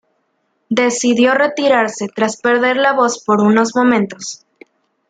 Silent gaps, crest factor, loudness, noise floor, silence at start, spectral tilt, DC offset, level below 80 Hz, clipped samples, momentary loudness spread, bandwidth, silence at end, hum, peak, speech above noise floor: none; 16 dB; -14 LUFS; -66 dBFS; 0.7 s; -4 dB/octave; under 0.1%; -64 dBFS; under 0.1%; 8 LU; 9.4 kHz; 0.75 s; none; 0 dBFS; 52 dB